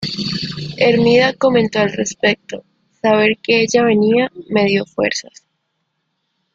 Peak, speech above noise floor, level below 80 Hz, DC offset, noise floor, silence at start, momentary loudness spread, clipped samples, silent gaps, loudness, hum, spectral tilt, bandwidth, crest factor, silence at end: 0 dBFS; 56 dB; -54 dBFS; under 0.1%; -71 dBFS; 0 s; 10 LU; under 0.1%; none; -15 LUFS; none; -4.5 dB/octave; 7.8 kHz; 16 dB; 1.35 s